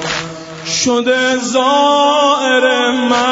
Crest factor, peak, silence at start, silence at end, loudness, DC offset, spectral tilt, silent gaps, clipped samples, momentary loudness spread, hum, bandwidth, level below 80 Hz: 12 dB; 0 dBFS; 0 s; 0 s; -12 LUFS; under 0.1%; -2.5 dB/octave; none; under 0.1%; 9 LU; none; 8 kHz; -52 dBFS